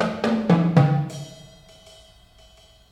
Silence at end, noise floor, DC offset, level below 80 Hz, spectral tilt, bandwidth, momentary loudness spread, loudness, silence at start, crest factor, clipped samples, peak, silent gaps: 1.55 s; -52 dBFS; under 0.1%; -56 dBFS; -8 dB/octave; 11 kHz; 19 LU; -20 LUFS; 0 s; 20 dB; under 0.1%; -4 dBFS; none